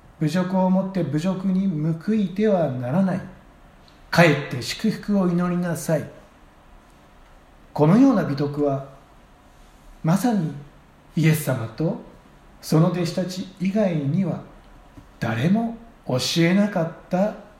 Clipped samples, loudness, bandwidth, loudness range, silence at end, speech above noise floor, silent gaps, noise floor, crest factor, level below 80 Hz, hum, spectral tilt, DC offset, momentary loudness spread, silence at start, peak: under 0.1%; -22 LUFS; 16 kHz; 3 LU; 0.15 s; 29 dB; none; -50 dBFS; 22 dB; -52 dBFS; none; -6.5 dB/octave; under 0.1%; 12 LU; 0.2 s; -2 dBFS